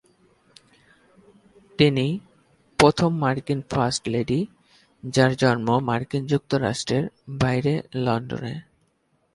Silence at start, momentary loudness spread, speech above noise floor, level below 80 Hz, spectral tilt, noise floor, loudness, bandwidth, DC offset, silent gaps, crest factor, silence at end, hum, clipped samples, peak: 1.8 s; 14 LU; 46 dB; -52 dBFS; -6 dB/octave; -68 dBFS; -23 LUFS; 11.5 kHz; under 0.1%; none; 22 dB; 0.75 s; none; under 0.1%; -2 dBFS